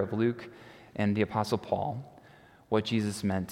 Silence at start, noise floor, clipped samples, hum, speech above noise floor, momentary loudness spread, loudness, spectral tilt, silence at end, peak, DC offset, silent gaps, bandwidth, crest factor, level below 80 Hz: 0 s; -57 dBFS; under 0.1%; none; 26 dB; 15 LU; -31 LUFS; -6.5 dB/octave; 0 s; -12 dBFS; under 0.1%; none; 15.5 kHz; 18 dB; -66 dBFS